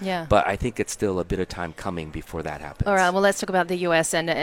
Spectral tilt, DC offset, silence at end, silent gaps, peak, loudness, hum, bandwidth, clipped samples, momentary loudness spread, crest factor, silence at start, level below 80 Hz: -4.5 dB/octave; under 0.1%; 0 s; none; -4 dBFS; -24 LUFS; none; 17 kHz; under 0.1%; 12 LU; 20 dB; 0 s; -42 dBFS